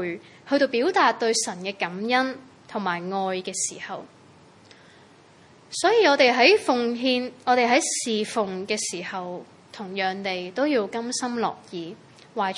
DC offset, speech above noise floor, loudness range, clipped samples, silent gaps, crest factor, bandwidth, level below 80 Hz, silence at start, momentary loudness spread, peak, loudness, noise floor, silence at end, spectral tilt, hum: under 0.1%; 29 dB; 8 LU; under 0.1%; none; 22 dB; 11.5 kHz; -78 dBFS; 0 s; 18 LU; -4 dBFS; -23 LUFS; -52 dBFS; 0 s; -2.5 dB/octave; none